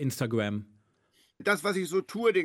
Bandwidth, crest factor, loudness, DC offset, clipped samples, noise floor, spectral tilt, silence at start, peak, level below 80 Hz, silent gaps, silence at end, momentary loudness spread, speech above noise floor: 16 kHz; 18 dB; -30 LUFS; under 0.1%; under 0.1%; -68 dBFS; -5.5 dB/octave; 0 s; -12 dBFS; -74 dBFS; none; 0 s; 6 LU; 40 dB